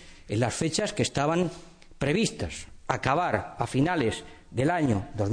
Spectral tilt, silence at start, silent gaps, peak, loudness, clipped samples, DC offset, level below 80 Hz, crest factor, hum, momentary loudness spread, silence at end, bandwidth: -5 dB/octave; 0 s; none; -10 dBFS; -28 LUFS; under 0.1%; under 0.1%; -50 dBFS; 18 dB; none; 10 LU; 0 s; 10.5 kHz